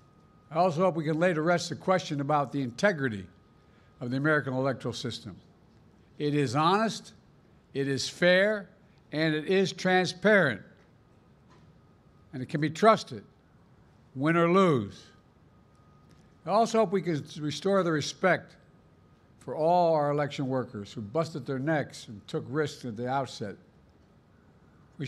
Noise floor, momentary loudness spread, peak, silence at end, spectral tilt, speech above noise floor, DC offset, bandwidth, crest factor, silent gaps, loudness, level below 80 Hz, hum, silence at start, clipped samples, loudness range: -60 dBFS; 16 LU; -8 dBFS; 0 s; -5.5 dB/octave; 32 dB; under 0.1%; 13 kHz; 22 dB; none; -28 LUFS; -68 dBFS; none; 0.5 s; under 0.1%; 5 LU